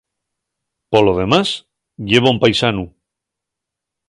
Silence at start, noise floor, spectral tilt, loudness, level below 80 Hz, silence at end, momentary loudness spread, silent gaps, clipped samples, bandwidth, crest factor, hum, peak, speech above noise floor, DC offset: 0.9 s; -82 dBFS; -5.5 dB/octave; -15 LUFS; -44 dBFS; 1.2 s; 13 LU; none; under 0.1%; 11.5 kHz; 18 dB; none; 0 dBFS; 68 dB; under 0.1%